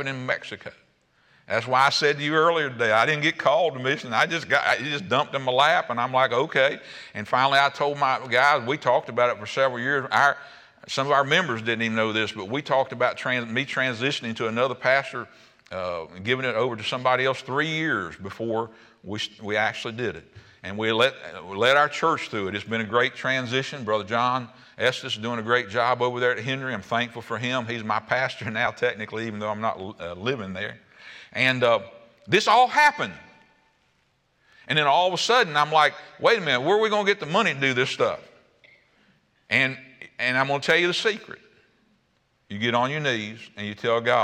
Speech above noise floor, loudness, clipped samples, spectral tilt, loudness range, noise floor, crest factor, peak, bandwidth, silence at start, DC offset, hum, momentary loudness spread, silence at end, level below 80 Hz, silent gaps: 44 dB; -23 LUFS; under 0.1%; -4 dB/octave; 5 LU; -68 dBFS; 18 dB; -6 dBFS; 15.5 kHz; 0 s; under 0.1%; none; 12 LU; 0 s; -70 dBFS; none